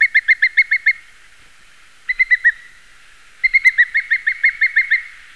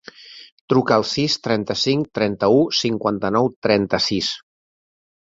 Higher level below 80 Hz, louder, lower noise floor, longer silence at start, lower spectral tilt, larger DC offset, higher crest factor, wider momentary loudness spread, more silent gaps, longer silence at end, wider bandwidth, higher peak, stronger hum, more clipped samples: about the same, -54 dBFS vs -54 dBFS; first, -14 LUFS vs -19 LUFS; first, -48 dBFS vs -42 dBFS; second, 0 s vs 0.2 s; second, 2 dB/octave vs -5 dB/octave; first, 0.5% vs under 0.1%; about the same, 16 dB vs 18 dB; about the same, 7 LU vs 8 LU; second, none vs 0.52-0.68 s, 3.56-3.62 s; second, 0.25 s vs 1 s; first, 12 kHz vs 7.8 kHz; about the same, -2 dBFS vs -2 dBFS; neither; neither